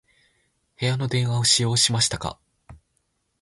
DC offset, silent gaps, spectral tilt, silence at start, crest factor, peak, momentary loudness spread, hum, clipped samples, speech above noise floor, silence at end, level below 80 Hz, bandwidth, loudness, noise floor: under 0.1%; none; -3 dB/octave; 0.8 s; 20 dB; -4 dBFS; 11 LU; none; under 0.1%; 50 dB; 0.65 s; -52 dBFS; 11.5 kHz; -21 LUFS; -72 dBFS